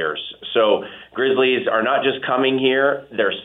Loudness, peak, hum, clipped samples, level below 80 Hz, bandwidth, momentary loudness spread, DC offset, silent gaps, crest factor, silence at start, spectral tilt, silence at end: -19 LUFS; -4 dBFS; none; under 0.1%; -64 dBFS; 4 kHz; 6 LU; under 0.1%; none; 16 dB; 0 s; -7 dB/octave; 0 s